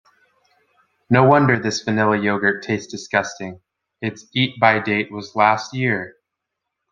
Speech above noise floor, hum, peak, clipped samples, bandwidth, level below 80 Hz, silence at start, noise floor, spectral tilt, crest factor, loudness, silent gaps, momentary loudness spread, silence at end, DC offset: 62 dB; none; -2 dBFS; under 0.1%; 7.6 kHz; -60 dBFS; 1.1 s; -80 dBFS; -5.5 dB/octave; 18 dB; -19 LUFS; none; 14 LU; 0.8 s; under 0.1%